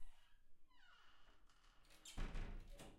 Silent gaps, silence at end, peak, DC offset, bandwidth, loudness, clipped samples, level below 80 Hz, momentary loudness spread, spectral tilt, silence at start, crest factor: none; 0 s; -36 dBFS; under 0.1%; 13.5 kHz; -56 LUFS; under 0.1%; -56 dBFS; 16 LU; -4 dB/octave; 0 s; 18 dB